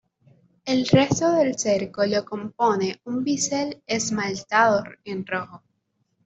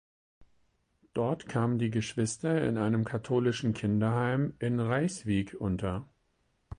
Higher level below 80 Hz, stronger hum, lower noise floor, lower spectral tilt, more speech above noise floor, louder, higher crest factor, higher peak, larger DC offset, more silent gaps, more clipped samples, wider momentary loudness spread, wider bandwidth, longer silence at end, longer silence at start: second, -60 dBFS vs -54 dBFS; neither; about the same, -72 dBFS vs -74 dBFS; second, -4.5 dB/octave vs -6.5 dB/octave; first, 49 dB vs 44 dB; first, -23 LUFS vs -31 LUFS; about the same, 20 dB vs 16 dB; first, -4 dBFS vs -14 dBFS; neither; neither; neither; first, 11 LU vs 5 LU; second, 8.2 kHz vs 10.5 kHz; first, 0.7 s vs 0.05 s; first, 0.65 s vs 0.4 s